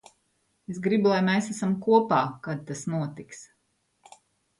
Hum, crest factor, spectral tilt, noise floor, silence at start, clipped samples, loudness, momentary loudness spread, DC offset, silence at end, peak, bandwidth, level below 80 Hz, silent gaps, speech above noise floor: none; 20 dB; -6 dB/octave; -73 dBFS; 0.7 s; under 0.1%; -25 LUFS; 21 LU; under 0.1%; 1.15 s; -8 dBFS; 11.5 kHz; -70 dBFS; none; 48 dB